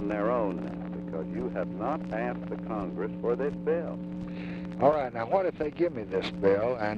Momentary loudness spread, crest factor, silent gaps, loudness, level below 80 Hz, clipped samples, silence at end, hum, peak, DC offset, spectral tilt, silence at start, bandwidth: 11 LU; 20 dB; none; -30 LUFS; -54 dBFS; under 0.1%; 0 s; none; -10 dBFS; under 0.1%; -8.5 dB/octave; 0 s; 7.4 kHz